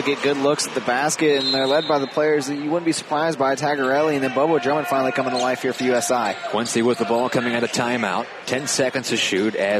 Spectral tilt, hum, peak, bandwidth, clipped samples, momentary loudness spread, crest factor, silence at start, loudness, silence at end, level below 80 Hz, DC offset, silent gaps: -3.5 dB/octave; none; -6 dBFS; 15 kHz; under 0.1%; 4 LU; 14 dB; 0 s; -20 LUFS; 0 s; -70 dBFS; under 0.1%; none